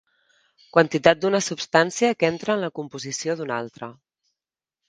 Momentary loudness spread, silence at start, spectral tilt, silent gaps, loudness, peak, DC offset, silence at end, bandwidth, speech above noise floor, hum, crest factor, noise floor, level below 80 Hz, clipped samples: 13 LU; 0.75 s; -4 dB/octave; none; -22 LUFS; 0 dBFS; under 0.1%; 0.95 s; 10 kHz; 68 dB; none; 24 dB; -90 dBFS; -66 dBFS; under 0.1%